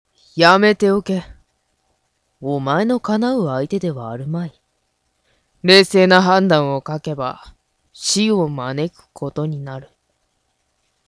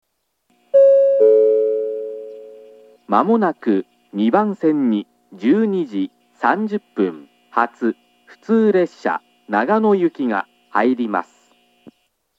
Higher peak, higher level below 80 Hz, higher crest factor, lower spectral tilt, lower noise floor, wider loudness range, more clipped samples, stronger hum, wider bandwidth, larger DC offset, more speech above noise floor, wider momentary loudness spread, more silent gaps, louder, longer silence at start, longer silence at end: about the same, 0 dBFS vs 0 dBFS; first, -54 dBFS vs -82 dBFS; about the same, 18 dB vs 18 dB; second, -4.5 dB/octave vs -8 dB/octave; about the same, -68 dBFS vs -67 dBFS; first, 7 LU vs 4 LU; neither; neither; first, 11 kHz vs 7.6 kHz; neither; about the same, 51 dB vs 49 dB; first, 17 LU vs 13 LU; neither; about the same, -17 LUFS vs -18 LUFS; second, 0.35 s vs 0.75 s; about the same, 1.25 s vs 1.15 s